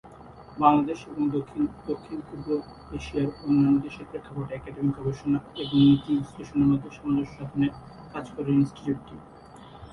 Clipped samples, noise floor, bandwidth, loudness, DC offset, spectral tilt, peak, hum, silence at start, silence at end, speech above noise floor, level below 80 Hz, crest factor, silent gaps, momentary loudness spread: under 0.1%; -47 dBFS; 6.6 kHz; -26 LUFS; under 0.1%; -8 dB/octave; -6 dBFS; none; 0.05 s; 0 s; 21 dB; -52 dBFS; 20 dB; none; 17 LU